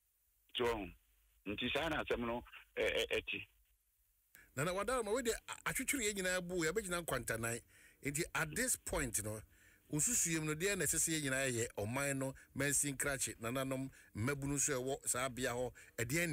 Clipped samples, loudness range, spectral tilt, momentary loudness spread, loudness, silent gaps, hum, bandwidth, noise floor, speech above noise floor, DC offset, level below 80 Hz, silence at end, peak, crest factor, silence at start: under 0.1%; 4 LU; -3 dB/octave; 10 LU; -38 LUFS; none; none; 16 kHz; -78 dBFS; 39 dB; under 0.1%; -60 dBFS; 0 s; -24 dBFS; 16 dB; 0.55 s